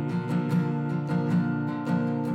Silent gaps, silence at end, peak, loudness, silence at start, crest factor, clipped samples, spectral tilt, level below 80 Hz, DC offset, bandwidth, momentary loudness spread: none; 0 s; -16 dBFS; -27 LUFS; 0 s; 10 dB; under 0.1%; -9 dB/octave; -66 dBFS; under 0.1%; 8.8 kHz; 3 LU